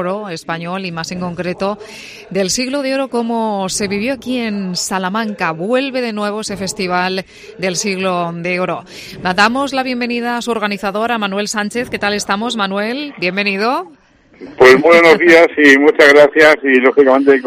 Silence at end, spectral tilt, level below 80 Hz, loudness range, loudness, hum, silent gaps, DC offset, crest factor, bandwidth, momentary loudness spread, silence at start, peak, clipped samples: 0 s; -4 dB/octave; -50 dBFS; 10 LU; -13 LUFS; none; none; under 0.1%; 14 dB; 15.5 kHz; 15 LU; 0 s; 0 dBFS; 0.2%